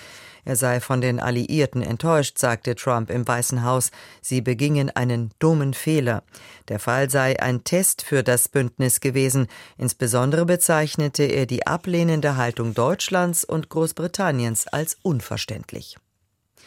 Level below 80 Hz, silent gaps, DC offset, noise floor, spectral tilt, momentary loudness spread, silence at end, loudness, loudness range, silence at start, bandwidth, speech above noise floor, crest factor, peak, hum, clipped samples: -56 dBFS; none; under 0.1%; -71 dBFS; -4.5 dB/octave; 7 LU; 0.75 s; -22 LUFS; 3 LU; 0 s; 16.5 kHz; 49 dB; 16 dB; -6 dBFS; none; under 0.1%